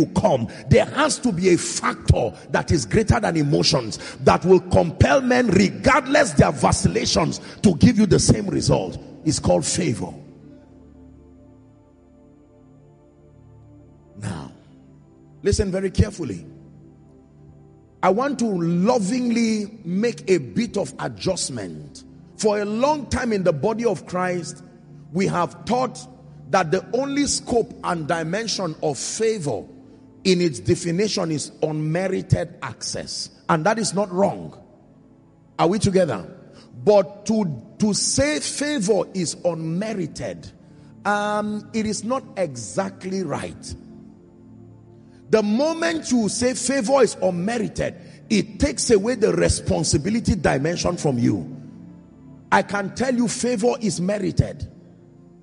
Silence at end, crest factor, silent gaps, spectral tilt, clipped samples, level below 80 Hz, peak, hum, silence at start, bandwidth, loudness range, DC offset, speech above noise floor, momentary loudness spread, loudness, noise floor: 0.65 s; 18 dB; none; -5 dB/octave; under 0.1%; -40 dBFS; -4 dBFS; none; 0 s; 11.5 kHz; 9 LU; under 0.1%; 31 dB; 12 LU; -21 LUFS; -52 dBFS